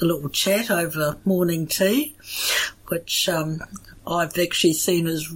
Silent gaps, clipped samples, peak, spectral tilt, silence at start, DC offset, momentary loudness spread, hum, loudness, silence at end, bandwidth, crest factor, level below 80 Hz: none; under 0.1%; -6 dBFS; -3.5 dB/octave; 0 s; under 0.1%; 10 LU; none; -22 LUFS; 0 s; 17 kHz; 16 dB; -52 dBFS